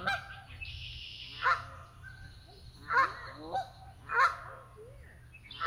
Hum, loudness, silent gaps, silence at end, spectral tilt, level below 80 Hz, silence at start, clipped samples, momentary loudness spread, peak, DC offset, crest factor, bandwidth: none; -33 LUFS; none; 0 s; -3.5 dB/octave; -56 dBFS; 0 s; under 0.1%; 24 LU; -14 dBFS; under 0.1%; 22 dB; 16 kHz